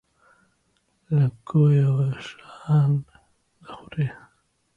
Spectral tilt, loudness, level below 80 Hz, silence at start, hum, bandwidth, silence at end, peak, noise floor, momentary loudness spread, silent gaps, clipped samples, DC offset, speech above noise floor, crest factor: -9.5 dB/octave; -22 LUFS; -60 dBFS; 1.1 s; none; 6.8 kHz; 0.65 s; -8 dBFS; -69 dBFS; 21 LU; none; under 0.1%; under 0.1%; 48 dB; 16 dB